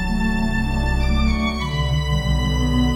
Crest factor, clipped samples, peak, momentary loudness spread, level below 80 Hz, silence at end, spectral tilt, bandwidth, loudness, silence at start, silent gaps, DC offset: 12 dB; under 0.1%; -6 dBFS; 2 LU; -22 dBFS; 0 s; -6 dB/octave; 14 kHz; -21 LUFS; 0 s; none; under 0.1%